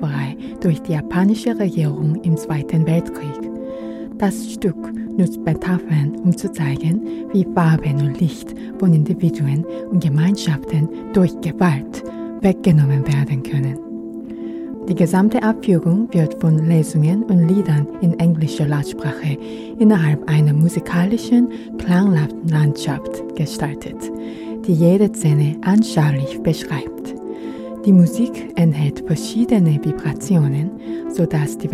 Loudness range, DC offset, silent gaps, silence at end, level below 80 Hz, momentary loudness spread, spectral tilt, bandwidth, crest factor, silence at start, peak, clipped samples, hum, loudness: 4 LU; under 0.1%; none; 0 s; -46 dBFS; 13 LU; -7.5 dB/octave; 13.5 kHz; 16 dB; 0 s; -2 dBFS; under 0.1%; none; -18 LUFS